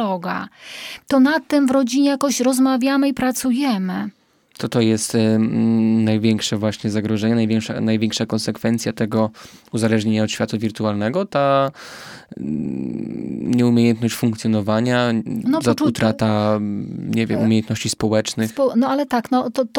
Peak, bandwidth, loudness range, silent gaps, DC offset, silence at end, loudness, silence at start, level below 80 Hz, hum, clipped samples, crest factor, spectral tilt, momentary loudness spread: -4 dBFS; 17.5 kHz; 3 LU; none; under 0.1%; 0 s; -19 LUFS; 0 s; -56 dBFS; none; under 0.1%; 16 dB; -5.5 dB/octave; 10 LU